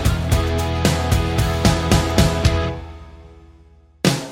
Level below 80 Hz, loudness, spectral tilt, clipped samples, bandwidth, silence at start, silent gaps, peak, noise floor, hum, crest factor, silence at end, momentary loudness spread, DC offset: -26 dBFS; -19 LUFS; -5 dB/octave; under 0.1%; 17 kHz; 0 s; none; 0 dBFS; -49 dBFS; none; 18 dB; 0 s; 7 LU; under 0.1%